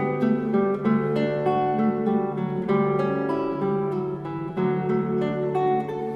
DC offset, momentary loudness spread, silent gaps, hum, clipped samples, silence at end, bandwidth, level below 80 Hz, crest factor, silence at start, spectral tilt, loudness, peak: under 0.1%; 5 LU; none; none; under 0.1%; 0 s; 5.6 kHz; -58 dBFS; 14 dB; 0 s; -9.5 dB/octave; -24 LUFS; -10 dBFS